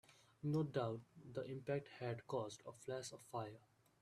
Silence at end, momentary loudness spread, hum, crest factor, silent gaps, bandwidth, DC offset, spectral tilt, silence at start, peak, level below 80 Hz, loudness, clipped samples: 0.4 s; 11 LU; none; 20 dB; none; 13.5 kHz; under 0.1%; -6.5 dB/octave; 0.1 s; -26 dBFS; -80 dBFS; -47 LUFS; under 0.1%